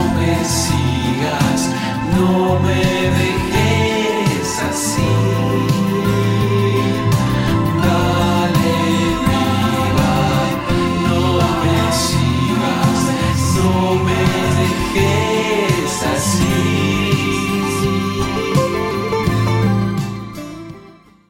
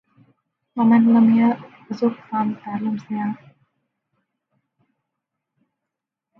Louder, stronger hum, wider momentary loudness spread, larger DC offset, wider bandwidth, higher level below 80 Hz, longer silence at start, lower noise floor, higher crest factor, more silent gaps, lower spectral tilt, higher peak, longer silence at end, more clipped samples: first, -16 LUFS vs -19 LUFS; neither; second, 3 LU vs 16 LU; neither; first, 16.5 kHz vs 5.8 kHz; first, -34 dBFS vs -72 dBFS; second, 0 s vs 0.75 s; second, -43 dBFS vs -84 dBFS; second, 12 dB vs 18 dB; neither; second, -5.5 dB/octave vs -9 dB/octave; about the same, -4 dBFS vs -4 dBFS; second, 0.4 s vs 3.05 s; neither